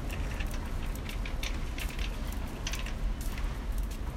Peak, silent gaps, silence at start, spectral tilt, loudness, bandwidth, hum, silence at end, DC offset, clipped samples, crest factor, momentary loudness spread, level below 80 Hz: -20 dBFS; none; 0 s; -4.5 dB/octave; -37 LUFS; 16.5 kHz; none; 0 s; under 0.1%; under 0.1%; 14 dB; 2 LU; -34 dBFS